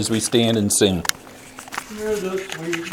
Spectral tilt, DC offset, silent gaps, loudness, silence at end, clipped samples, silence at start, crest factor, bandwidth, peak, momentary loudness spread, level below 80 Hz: -3.5 dB/octave; under 0.1%; none; -20 LUFS; 0 s; under 0.1%; 0 s; 22 dB; 20 kHz; 0 dBFS; 18 LU; -50 dBFS